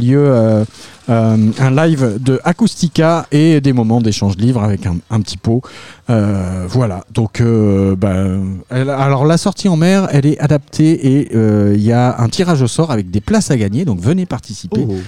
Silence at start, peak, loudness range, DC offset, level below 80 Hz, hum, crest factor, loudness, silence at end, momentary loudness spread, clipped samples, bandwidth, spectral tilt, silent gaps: 0 s; 0 dBFS; 3 LU; 0.6%; -42 dBFS; none; 12 dB; -13 LUFS; 0 s; 7 LU; under 0.1%; 12.5 kHz; -7 dB/octave; none